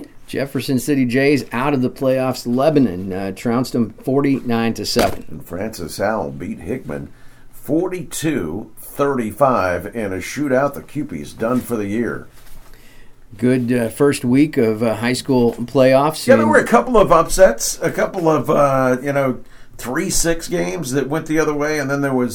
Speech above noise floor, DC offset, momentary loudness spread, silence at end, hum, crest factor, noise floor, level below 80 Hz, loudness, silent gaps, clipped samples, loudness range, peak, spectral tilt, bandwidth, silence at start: 21 dB; under 0.1%; 13 LU; 0 s; none; 18 dB; -38 dBFS; -36 dBFS; -18 LUFS; none; under 0.1%; 9 LU; 0 dBFS; -5 dB/octave; over 20 kHz; 0 s